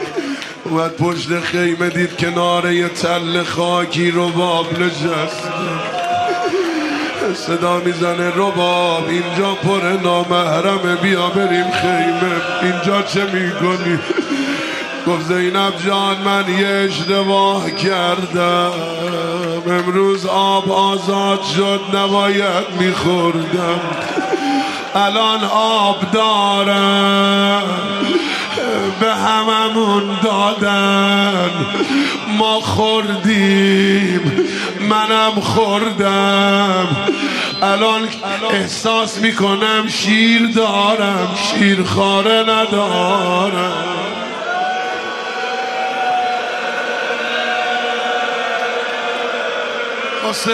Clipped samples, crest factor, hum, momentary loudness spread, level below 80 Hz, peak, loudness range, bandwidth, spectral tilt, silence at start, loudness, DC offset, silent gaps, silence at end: under 0.1%; 14 dB; none; 7 LU; -60 dBFS; -2 dBFS; 4 LU; 13.5 kHz; -4.5 dB/octave; 0 s; -15 LUFS; under 0.1%; none; 0 s